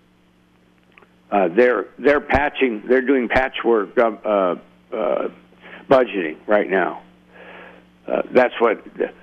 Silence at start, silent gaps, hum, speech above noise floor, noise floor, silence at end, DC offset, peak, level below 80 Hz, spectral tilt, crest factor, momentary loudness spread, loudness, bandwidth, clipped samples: 1.3 s; none; none; 38 dB; -56 dBFS; 0.1 s; under 0.1%; -2 dBFS; -44 dBFS; -7 dB/octave; 18 dB; 9 LU; -19 LUFS; 7 kHz; under 0.1%